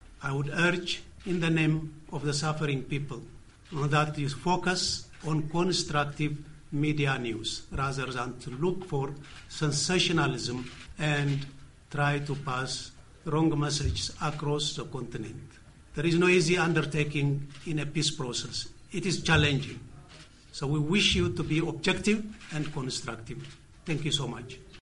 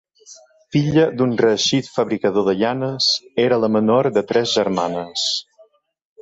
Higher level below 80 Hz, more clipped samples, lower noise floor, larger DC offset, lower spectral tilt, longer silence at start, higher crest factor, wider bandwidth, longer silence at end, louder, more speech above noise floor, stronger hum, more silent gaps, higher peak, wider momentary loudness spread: first, -48 dBFS vs -56 dBFS; neither; about the same, -52 dBFS vs -54 dBFS; neither; about the same, -4.5 dB/octave vs -4.5 dB/octave; second, 0.05 s vs 0.3 s; about the same, 20 dB vs 16 dB; first, 11 kHz vs 8 kHz; second, 0 s vs 0.8 s; second, -29 LUFS vs -18 LUFS; second, 22 dB vs 36 dB; neither; neither; second, -10 dBFS vs -4 dBFS; first, 16 LU vs 5 LU